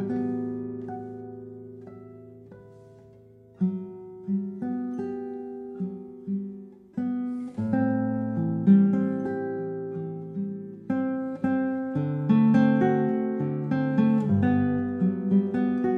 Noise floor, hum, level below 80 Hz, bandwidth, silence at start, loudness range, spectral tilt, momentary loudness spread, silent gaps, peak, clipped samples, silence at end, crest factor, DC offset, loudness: -52 dBFS; none; -70 dBFS; 4.5 kHz; 0 s; 12 LU; -10.5 dB/octave; 19 LU; none; -8 dBFS; under 0.1%; 0 s; 18 dB; under 0.1%; -26 LUFS